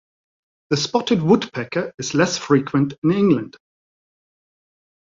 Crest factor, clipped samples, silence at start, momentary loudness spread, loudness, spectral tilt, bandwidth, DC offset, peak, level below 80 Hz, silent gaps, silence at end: 18 dB; under 0.1%; 0.7 s; 8 LU; -19 LUFS; -5.5 dB/octave; 7.8 kHz; under 0.1%; -4 dBFS; -58 dBFS; 1.94-1.98 s, 2.98-3.02 s; 1.65 s